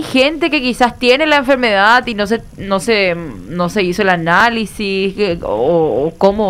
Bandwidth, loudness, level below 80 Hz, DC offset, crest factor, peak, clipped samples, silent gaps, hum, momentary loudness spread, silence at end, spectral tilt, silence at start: 15.5 kHz; -13 LUFS; -38 dBFS; under 0.1%; 14 dB; 0 dBFS; under 0.1%; none; none; 8 LU; 0 s; -5 dB/octave; 0 s